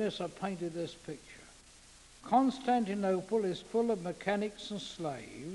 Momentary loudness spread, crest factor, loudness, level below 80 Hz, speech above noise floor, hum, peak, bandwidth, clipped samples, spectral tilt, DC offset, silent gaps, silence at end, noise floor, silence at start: 17 LU; 20 dB; -34 LUFS; -66 dBFS; 24 dB; none; -16 dBFS; 11.5 kHz; under 0.1%; -5.5 dB/octave; under 0.1%; none; 0 s; -58 dBFS; 0 s